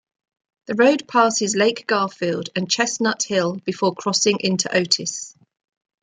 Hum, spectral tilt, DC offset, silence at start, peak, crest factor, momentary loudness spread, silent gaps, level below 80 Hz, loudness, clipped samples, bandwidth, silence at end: none; -3 dB/octave; under 0.1%; 0.7 s; -2 dBFS; 18 dB; 8 LU; none; -68 dBFS; -20 LUFS; under 0.1%; 9.6 kHz; 0.7 s